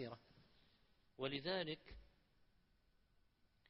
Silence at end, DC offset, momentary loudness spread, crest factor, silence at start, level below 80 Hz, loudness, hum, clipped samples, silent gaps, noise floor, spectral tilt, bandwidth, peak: 1.65 s; under 0.1%; 20 LU; 22 dB; 0 s; -72 dBFS; -46 LUFS; none; under 0.1%; none; -77 dBFS; -3 dB/octave; 5.6 kHz; -28 dBFS